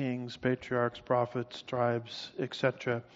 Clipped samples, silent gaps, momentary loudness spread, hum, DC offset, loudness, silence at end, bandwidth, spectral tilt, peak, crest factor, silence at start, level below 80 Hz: under 0.1%; none; 7 LU; none; under 0.1%; -33 LUFS; 0.15 s; 7.6 kHz; -4.5 dB/octave; -12 dBFS; 20 dB; 0 s; -68 dBFS